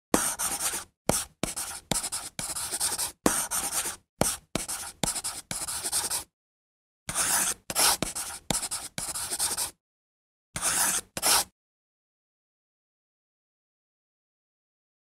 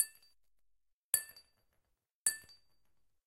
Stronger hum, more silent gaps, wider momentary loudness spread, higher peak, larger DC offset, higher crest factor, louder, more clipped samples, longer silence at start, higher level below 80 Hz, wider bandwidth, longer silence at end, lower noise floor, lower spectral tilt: neither; first, 0.97-1.05 s, 4.09-4.17 s, 6.33-7.06 s, 9.80-10.53 s vs 0.93-1.13 s, 2.12-2.25 s; second, 10 LU vs 13 LU; first, 0 dBFS vs -12 dBFS; neither; about the same, 30 dB vs 32 dB; first, -28 LUFS vs -35 LUFS; neither; first, 0.15 s vs 0 s; first, -54 dBFS vs -82 dBFS; about the same, 16 kHz vs 16 kHz; first, 3.55 s vs 0.85 s; first, under -90 dBFS vs -82 dBFS; first, -1 dB/octave vs 2.5 dB/octave